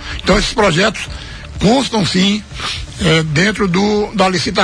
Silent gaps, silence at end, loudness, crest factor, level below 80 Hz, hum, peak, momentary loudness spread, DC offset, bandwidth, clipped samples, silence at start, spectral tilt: none; 0 s; -14 LUFS; 14 dB; -30 dBFS; none; 0 dBFS; 9 LU; under 0.1%; 10.5 kHz; under 0.1%; 0 s; -4.5 dB/octave